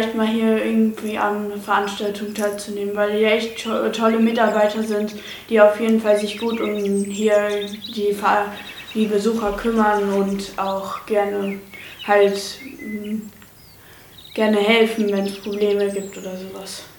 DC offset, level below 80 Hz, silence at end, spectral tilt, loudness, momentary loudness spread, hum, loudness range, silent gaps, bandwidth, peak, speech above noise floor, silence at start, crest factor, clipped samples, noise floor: under 0.1%; -54 dBFS; 0.05 s; -5 dB/octave; -20 LUFS; 14 LU; none; 4 LU; none; 19 kHz; 0 dBFS; 26 dB; 0 s; 20 dB; under 0.1%; -45 dBFS